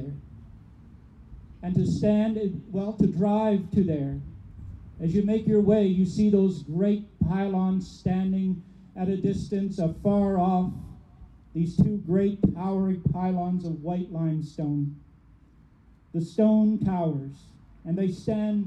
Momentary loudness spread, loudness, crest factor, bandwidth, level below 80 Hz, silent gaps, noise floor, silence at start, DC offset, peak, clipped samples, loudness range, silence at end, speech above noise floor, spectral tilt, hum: 13 LU; -26 LUFS; 16 dB; 8.4 kHz; -48 dBFS; none; -56 dBFS; 0 s; under 0.1%; -10 dBFS; under 0.1%; 4 LU; 0 s; 31 dB; -9.5 dB/octave; none